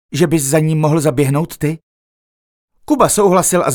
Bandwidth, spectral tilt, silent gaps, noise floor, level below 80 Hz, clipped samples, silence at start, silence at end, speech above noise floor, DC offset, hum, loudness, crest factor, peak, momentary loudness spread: 19.5 kHz; -5.5 dB/octave; 1.83-2.68 s; under -90 dBFS; -44 dBFS; under 0.1%; 0.1 s; 0 s; over 77 dB; under 0.1%; none; -14 LUFS; 14 dB; 0 dBFS; 9 LU